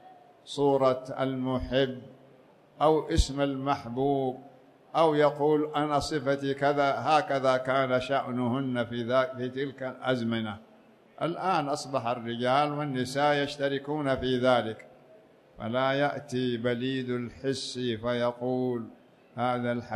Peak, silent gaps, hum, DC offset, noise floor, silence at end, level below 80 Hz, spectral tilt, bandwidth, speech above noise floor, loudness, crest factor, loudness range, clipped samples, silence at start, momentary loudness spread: -10 dBFS; none; none; under 0.1%; -57 dBFS; 0 s; -46 dBFS; -6 dB/octave; 13 kHz; 30 dB; -28 LUFS; 18 dB; 4 LU; under 0.1%; 0.05 s; 9 LU